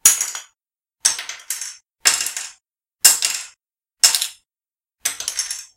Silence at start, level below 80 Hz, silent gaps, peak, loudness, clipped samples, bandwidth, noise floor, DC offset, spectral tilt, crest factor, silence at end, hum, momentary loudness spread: 0.05 s; -66 dBFS; none; 0 dBFS; -18 LUFS; under 0.1%; 17 kHz; under -90 dBFS; under 0.1%; 4 dB/octave; 22 dB; 0.1 s; none; 16 LU